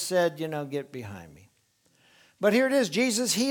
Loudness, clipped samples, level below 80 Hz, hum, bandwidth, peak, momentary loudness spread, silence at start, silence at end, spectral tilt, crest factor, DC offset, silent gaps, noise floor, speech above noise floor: -26 LUFS; under 0.1%; -72 dBFS; none; 19.5 kHz; -10 dBFS; 17 LU; 0 s; 0 s; -3.5 dB/octave; 18 dB; under 0.1%; none; -68 dBFS; 42 dB